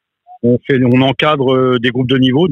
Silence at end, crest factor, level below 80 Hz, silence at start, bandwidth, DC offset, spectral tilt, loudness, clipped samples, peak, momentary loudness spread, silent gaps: 0 s; 12 dB; -52 dBFS; 0.3 s; 6.4 kHz; under 0.1%; -8 dB/octave; -12 LUFS; under 0.1%; 0 dBFS; 4 LU; none